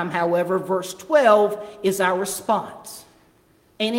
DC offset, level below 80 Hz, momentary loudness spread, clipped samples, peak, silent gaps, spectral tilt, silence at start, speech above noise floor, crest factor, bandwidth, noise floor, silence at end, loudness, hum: under 0.1%; -66 dBFS; 19 LU; under 0.1%; -4 dBFS; none; -4 dB/octave; 0 s; 37 dB; 18 dB; 17 kHz; -58 dBFS; 0 s; -21 LUFS; none